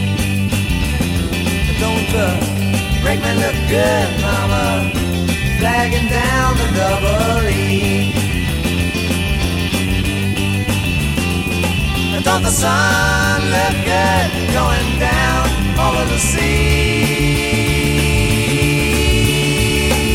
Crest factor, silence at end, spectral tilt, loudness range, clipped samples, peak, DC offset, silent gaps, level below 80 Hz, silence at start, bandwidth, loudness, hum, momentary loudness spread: 14 dB; 0 s; -4.5 dB/octave; 3 LU; under 0.1%; -2 dBFS; under 0.1%; none; -22 dBFS; 0 s; 16.5 kHz; -15 LUFS; none; 4 LU